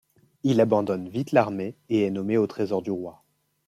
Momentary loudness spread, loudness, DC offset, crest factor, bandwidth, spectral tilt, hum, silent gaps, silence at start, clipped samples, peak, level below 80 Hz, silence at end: 10 LU; -25 LUFS; under 0.1%; 20 dB; 14 kHz; -7.5 dB/octave; none; none; 0.45 s; under 0.1%; -4 dBFS; -70 dBFS; 0.55 s